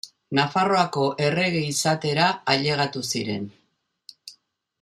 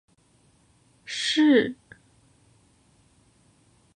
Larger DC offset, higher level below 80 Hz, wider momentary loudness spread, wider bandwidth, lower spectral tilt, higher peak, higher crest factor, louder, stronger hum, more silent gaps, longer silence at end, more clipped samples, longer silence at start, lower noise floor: neither; about the same, -66 dBFS vs -70 dBFS; second, 10 LU vs 27 LU; first, 14.5 kHz vs 10 kHz; about the same, -4 dB/octave vs -3.5 dB/octave; first, -4 dBFS vs -8 dBFS; about the same, 20 dB vs 22 dB; about the same, -23 LUFS vs -22 LUFS; neither; neither; second, 0.5 s vs 2.25 s; neither; second, 0.05 s vs 1.1 s; first, -70 dBFS vs -62 dBFS